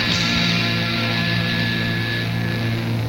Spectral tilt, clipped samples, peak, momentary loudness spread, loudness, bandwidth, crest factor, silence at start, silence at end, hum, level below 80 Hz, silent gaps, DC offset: -5 dB/octave; under 0.1%; -4 dBFS; 5 LU; -20 LUFS; 16.5 kHz; 16 dB; 0 s; 0 s; none; -42 dBFS; none; under 0.1%